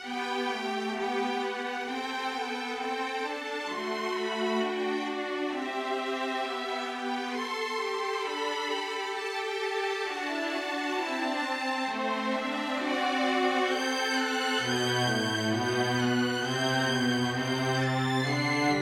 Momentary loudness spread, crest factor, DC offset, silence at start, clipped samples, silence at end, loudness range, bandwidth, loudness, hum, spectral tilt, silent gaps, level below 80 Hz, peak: 6 LU; 16 dB; under 0.1%; 0 s; under 0.1%; 0 s; 4 LU; 16.5 kHz; -30 LUFS; none; -4 dB/octave; none; -74 dBFS; -14 dBFS